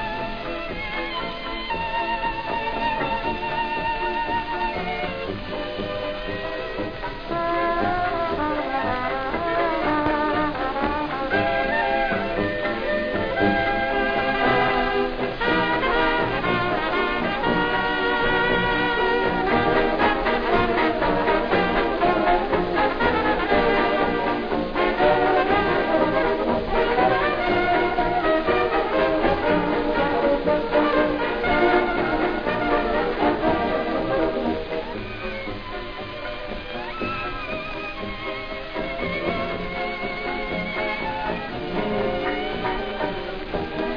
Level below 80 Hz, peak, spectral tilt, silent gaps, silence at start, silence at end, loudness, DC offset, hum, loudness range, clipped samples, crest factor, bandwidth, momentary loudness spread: -38 dBFS; -6 dBFS; -7 dB/octave; none; 0 s; 0 s; -23 LUFS; 0.6%; none; 7 LU; under 0.1%; 16 dB; 5.2 kHz; 9 LU